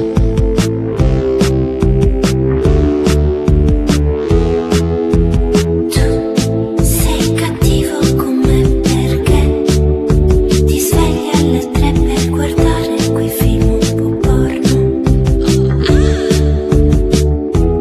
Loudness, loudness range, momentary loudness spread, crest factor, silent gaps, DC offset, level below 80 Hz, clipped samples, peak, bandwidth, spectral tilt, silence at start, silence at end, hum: -13 LUFS; 1 LU; 3 LU; 12 dB; none; under 0.1%; -16 dBFS; under 0.1%; 0 dBFS; 14 kHz; -6.5 dB/octave; 0 s; 0 s; none